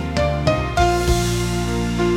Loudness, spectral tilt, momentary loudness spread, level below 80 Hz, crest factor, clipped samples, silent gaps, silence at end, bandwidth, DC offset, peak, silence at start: -19 LUFS; -5.5 dB/octave; 4 LU; -26 dBFS; 16 dB; under 0.1%; none; 0 s; 16.5 kHz; under 0.1%; -2 dBFS; 0 s